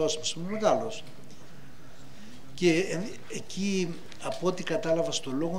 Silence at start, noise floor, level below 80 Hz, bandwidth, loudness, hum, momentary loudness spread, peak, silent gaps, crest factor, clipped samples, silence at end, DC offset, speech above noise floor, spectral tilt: 0 s; -51 dBFS; -66 dBFS; 16 kHz; -30 LUFS; none; 24 LU; -10 dBFS; none; 22 dB; under 0.1%; 0 s; 2%; 21 dB; -4.5 dB/octave